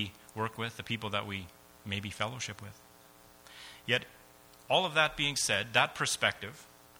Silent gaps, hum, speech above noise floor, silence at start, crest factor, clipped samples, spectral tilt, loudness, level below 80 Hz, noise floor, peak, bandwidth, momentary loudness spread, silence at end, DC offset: none; none; 25 dB; 0 s; 24 dB; under 0.1%; -2.5 dB/octave; -32 LUFS; -64 dBFS; -58 dBFS; -10 dBFS; over 20 kHz; 22 LU; 0.3 s; under 0.1%